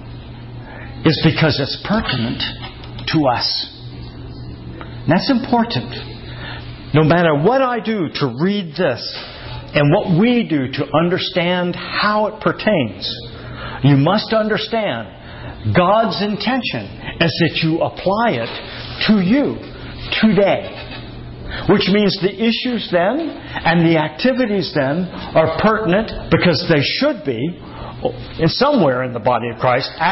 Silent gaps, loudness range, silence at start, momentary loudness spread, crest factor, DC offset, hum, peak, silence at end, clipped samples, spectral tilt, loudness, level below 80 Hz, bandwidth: none; 3 LU; 0 s; 17 LU; 14 dB; under 0.1%; none; -2 dBFS; 0 s; under 0.1%; -9 dB/octave; -17 LUFS; -40 dBFS; 6 kHz